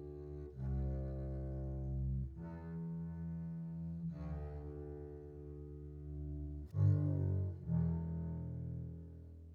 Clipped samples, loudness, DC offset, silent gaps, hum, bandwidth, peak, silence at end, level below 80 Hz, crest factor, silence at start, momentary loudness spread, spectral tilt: under 0.1%; -42 LUFS; under 0.1%; none; none; 2.5 kHz; -22 dBFS; 0 s; -48 dBFS; 18 dB; 0 s; 14 LU; -12 dB/octave